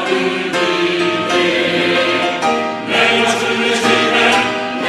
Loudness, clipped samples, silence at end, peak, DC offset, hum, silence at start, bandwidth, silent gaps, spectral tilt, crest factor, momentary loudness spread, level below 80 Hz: -14 LUFS; under 0.1%; 0 s; 0 dBFS; under 0.1%; none; 0 s; 14 kHz; none; -3 dB/octave; 14 dB; 5 LU; -56 dBFS